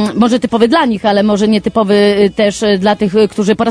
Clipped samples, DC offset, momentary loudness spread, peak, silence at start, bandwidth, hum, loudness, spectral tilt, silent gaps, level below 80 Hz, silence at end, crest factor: under 0.1%; under 0.1%; 2 LU; 0 dBFS; 0 s; 10.5 kHz; none; -11 LUFS; -5.5 dB/octave; none; -44 dBFS; 0 s; 10 dB